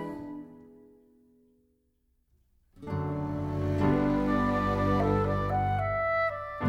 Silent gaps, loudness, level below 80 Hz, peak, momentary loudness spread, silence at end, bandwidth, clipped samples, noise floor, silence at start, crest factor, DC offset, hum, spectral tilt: none; -29 LUFS; -44 dBFS; -12 dBFS; 14 LU; 0 s; 8.4 kHz; under 0.1%; -72 dBFS; 0 s; 18 dB; under 0.1%; none; -8.5 dB/octave